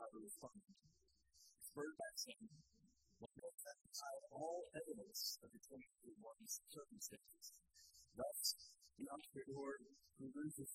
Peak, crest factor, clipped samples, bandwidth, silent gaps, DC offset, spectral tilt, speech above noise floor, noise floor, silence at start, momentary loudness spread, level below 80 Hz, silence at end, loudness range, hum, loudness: -30 dBFS; 24 dB; under 0.1%; 15.5 kHz; none; under 0.1%; -2.5 dB/octave; 26 dB; -79 dBFS; 0 s; 17 LU; -84 dBFS; 0 s; 5 LU; none; -52 LUFS